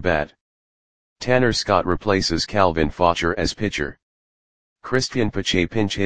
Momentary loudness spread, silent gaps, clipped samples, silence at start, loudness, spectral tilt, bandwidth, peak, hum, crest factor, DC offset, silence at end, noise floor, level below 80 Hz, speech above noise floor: 8 LU; 0.41-1.16 s, 4.02-4.76 s; under 0.1%; 0 s; -21 LUFS; -4.5 dB/octave; 10 kHz; 0 dBFS; none; 20 dB; 1%; 0 s; under -90 dBFS; -40 dBFS; over 70 dB